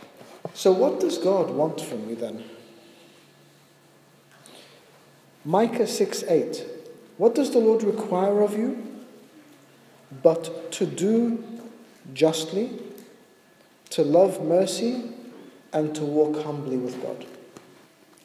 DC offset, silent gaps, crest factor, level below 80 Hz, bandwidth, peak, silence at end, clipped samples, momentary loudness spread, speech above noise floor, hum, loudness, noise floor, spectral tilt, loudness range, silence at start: under 0.1%; none; 22 dB; -80 dBFS; 15.5 kHz; -2 dBFS; 0.8 s; under 0.1%; 20 LU; 33 dB; none; -24 LUFS; -56 dBFS; -5.5 dB/octave; 6 LU; 0 s